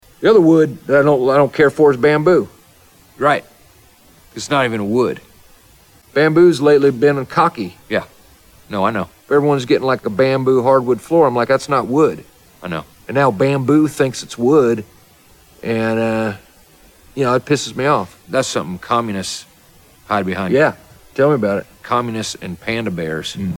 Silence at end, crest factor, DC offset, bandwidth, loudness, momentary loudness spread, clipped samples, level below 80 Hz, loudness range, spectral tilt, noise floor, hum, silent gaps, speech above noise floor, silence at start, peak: 0 s; 14 dB; under 0.1%; 17.5 kHz; -16 LUFS; 13 LU; under 0.1%; -52 dBFS; 5 LU; -6 dB/octave; -48 dBFS; none; none; 33 dB; 0.2 s; -2 dBFS